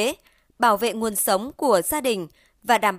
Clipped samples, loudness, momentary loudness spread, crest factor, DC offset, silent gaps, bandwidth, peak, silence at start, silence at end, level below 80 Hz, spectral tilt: under 0.1%; -22 LUFS; 13 LU; 16 dB; under 0.1%; none; 16 kHz; -6 dBFS; 0 s; 0 s; -56 dBFS; -2.5 dB/octave